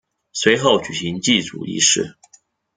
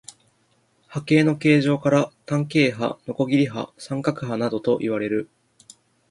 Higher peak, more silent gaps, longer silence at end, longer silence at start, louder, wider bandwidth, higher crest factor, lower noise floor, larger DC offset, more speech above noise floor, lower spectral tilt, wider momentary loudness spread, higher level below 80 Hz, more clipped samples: about the same, -2 dBFS vs -4 dBFS; neither; second, 0.65 s vs 0.85 s; second, 0.35 s vs 0.9 s; first, -17 LUFS vs -22 LUFS; second, 10 kHz vs 11.5 kHz; about the same, 18 dB vs 18 dB; second, -55 dBFS vs -64 dBFS; neither; second, 37 dB vs 43 dB; second, -2.5 dB/octave vs -6.5 dB/octave; about the same, 12 LU vs 11 LU; about the same, -58 dBFS vs -62 dBFS; neither